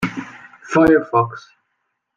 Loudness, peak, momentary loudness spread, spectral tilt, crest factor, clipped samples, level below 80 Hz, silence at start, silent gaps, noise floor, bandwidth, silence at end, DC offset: -17 LUFS; -2 dBFS; 22 LU; -7 dB/octave; 16 dB; under 0.1%; -50 dBFS; 0 s; none; -73 dBFS; 9.2 kHz; 0.8 s; under 0.1%